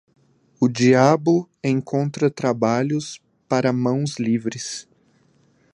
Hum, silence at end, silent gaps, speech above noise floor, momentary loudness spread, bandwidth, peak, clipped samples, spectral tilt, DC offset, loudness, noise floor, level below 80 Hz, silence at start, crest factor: none; 0.95 s; none; 40 dB; 13 LU; 11 kHz; 0 dBFS; under 0.1%; -6 dB/octave; under 0.1%; -21 LUFS; -60 dBFS; -64 dBFS; 0.6 s; 20 dB